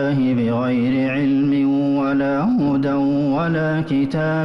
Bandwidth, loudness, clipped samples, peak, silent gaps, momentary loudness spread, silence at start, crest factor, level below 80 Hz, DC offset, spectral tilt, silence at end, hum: 6 kHz; -19 LUFS; under 0.1%; -10 dBFS; none; 2 LU; 0 s; 6 dB; -50 dBFS; under 0.1%; -9 dB/octave; 0 s; none